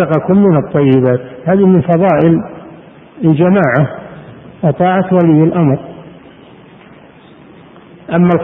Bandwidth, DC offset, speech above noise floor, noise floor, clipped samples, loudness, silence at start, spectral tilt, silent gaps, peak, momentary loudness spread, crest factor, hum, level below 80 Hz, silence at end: 3.7 kHz; under 0.1%; 29 dB; -39 dBFS; under 0.1%; -11 LUFS; 0 s; -11.5 dB/octave; none; 0 dBFS; 9 LU; 12 dB; none; -46 dBFS; 0 s